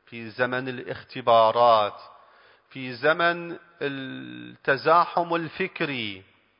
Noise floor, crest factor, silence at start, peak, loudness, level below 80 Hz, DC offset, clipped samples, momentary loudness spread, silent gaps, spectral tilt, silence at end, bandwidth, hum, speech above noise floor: -56 dBFS; 20 dB; 0.1 s; -6 dBFS; -24 LUFS; -70 dBFS; under 0.1%; under 0.1%; 18 LU; none; -9 dB/octave; 0.4 s; 5.4 kHz; none; 32 dB